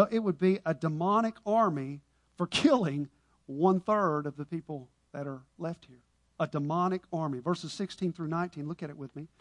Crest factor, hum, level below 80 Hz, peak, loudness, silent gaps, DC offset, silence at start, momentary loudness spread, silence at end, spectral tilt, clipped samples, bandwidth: 22 dB; none; -70 dBFS; -10 dBFS; -31 LUFS; none; under 0.1%; 0 s; 15 LU; 0.15 s; -6.5 dB/octave; under 0.1%; 11 kHz